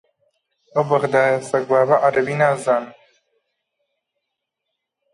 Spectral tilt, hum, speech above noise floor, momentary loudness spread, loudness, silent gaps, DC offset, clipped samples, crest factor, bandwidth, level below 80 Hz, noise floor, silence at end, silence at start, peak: -6 dB/octave; none; 62 dB; 7 LU; -18 LUFS; none; under 0.1%; under 0.1%; 18 dB; 11.5 kHz; -68 dBFS; -80 dBFS; 2.2 s; 0.75 s; -4 dBFS